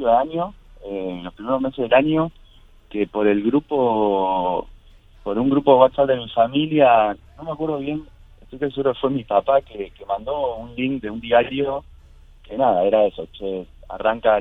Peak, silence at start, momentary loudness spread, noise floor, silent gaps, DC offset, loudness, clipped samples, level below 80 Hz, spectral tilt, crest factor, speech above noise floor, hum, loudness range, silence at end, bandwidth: 0 dBFS; 0 s; 15 LU; -48 dBFS; none; under 0.1%; -20 LUFS; under 0.1%; -46 dBFS; -8.5 dB/octave; 20 dB; 29 dB; none; 5 LU; 0 s; 4 kHz